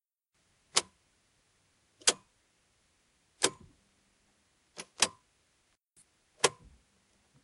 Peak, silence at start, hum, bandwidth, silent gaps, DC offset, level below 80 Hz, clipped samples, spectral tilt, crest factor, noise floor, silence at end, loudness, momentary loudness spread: -6 dBFS; 0.75 s; none; 12 kHz; none; under 0.1%; -74 dBFS; under 0.1%; 0 dB/octave; 32 dB; -77 dBFS; 0.95 s; -31 LUFS; 19 LU